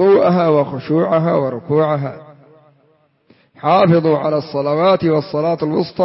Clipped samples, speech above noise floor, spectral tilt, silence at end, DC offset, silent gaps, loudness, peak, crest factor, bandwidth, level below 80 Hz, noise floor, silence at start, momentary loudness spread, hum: under 0.1%; 42 dB; -11.5 dB/octave; 0 s; under 0.1%; none; -15 LUFS; -2 dBFS; 12 dB; 5.8 kHz; -58 dBFS; -57 dBFS; 0 s; 7 LU; none